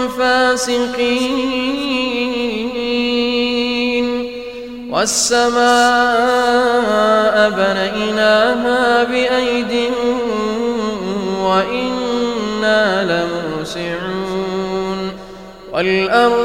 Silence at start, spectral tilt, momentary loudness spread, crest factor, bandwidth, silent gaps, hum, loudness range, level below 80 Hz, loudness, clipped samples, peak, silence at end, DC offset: 0 s; -3.5 dB/octave; 9 LU; 16 dB; 16 kHz; none; none; 5 LU; -44 dBFS; -16 LUFS; under 0.1%; 0 dBFS; 0 s; under 0.1%